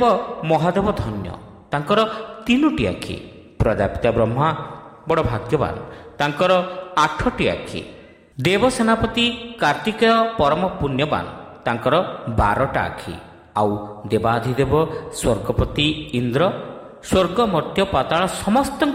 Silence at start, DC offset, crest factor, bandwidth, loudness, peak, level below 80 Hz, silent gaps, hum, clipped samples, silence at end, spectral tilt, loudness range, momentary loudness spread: 0 s; under 0.1%; 16 dB; 16 kHz; -20 LUFS; -4 dBFS; -38 dBFS; none; none; under 0.1%; 0 s; -5.5 dB/octave; 3 LU; 13 LU